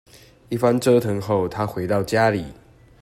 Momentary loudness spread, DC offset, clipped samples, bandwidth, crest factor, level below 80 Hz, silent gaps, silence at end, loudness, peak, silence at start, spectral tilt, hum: 10 LU; under 0.1%; under 0.1%; 16 kHz; 16 dB; -52 dBFS; none; 0.5 s; -21 LUFS; -4 dBFS; 0.5 s; -6.5 dB/octave; none